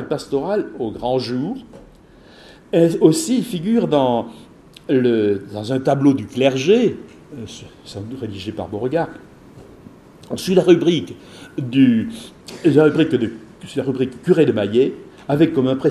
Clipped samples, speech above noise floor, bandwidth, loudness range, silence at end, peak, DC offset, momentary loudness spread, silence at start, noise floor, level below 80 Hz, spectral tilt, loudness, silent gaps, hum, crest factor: under 0.1%; 28 dB; 13.5 kHz; 5 LU; 0 s; 0 dBFS; under 0.1%; 20 LU; 0 s; -46 dBFS; -54 dBFS; -6.5 dB/octave; -18 LUFS; none; none; 18 dB